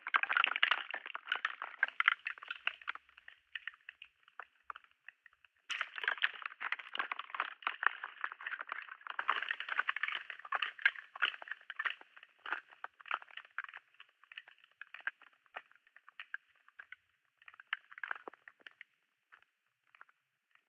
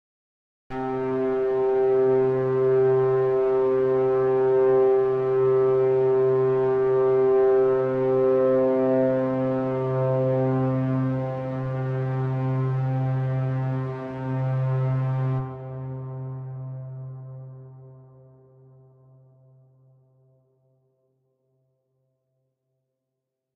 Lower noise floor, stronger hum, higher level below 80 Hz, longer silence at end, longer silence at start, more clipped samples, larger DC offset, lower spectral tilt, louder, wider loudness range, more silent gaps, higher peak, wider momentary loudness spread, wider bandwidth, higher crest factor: about the same, -80 dBFS vs -83 dBFS; neither; second, under -90 dBFS vs -58 dBFS; second, 1.35 s vs 5.6 s; second, 0 s vs 0.7 s; neither; neither; second, 1.5 dB/octave vs -11 dB/octave; second, -38 LUFS vs -23 LUFS; about the same, 12 LU vs 12 LU; neither; about the same, -10 dBFS vs -12 dBFS; first, 24 LU vs 14 LU; first, 9.6 kHz vs 4.1 kHz; first, 32 dB vs 12 dB